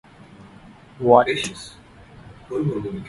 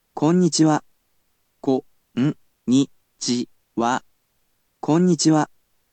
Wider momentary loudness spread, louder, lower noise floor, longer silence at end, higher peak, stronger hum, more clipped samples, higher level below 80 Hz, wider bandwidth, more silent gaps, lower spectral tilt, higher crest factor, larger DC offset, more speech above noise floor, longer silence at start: first, 19 LU vs 12 LU; about the same, -20 LUFS vs -21 LUFS; second, -46 dBFS vs -68 dBFS; second, 0 s vs 0.45 s; first, 0 dBFS vs -6 dBFS; neither; neither; first, -52 dBFS vs -70 dBFS; first, 11.5 kHz vs 9.2 kHz; neither; about the same, -5.5 dB/octave vs -5.5 dB/octave; first, 22 dB vs 16 dB; neither; second, 26 dB vs 50 dB; first, 0.4 s vs 0.15 s